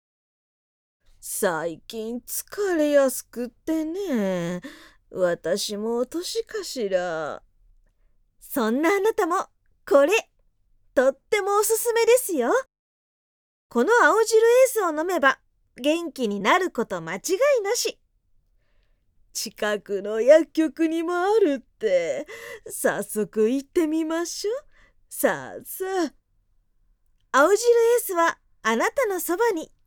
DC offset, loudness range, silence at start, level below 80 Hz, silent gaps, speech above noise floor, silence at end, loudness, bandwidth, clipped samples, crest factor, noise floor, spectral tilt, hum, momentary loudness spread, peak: under 0.1%; 6 LU; 1.25 s; -62 dBFS; 12.79-13.70 s; 43 dB; 0.2 s; -23 LUFS; 19.5 kHz; under 0.1%; 20 dB; -65 dBFS; -3.5 dB/octave; none; 14 LU; -4 dBFS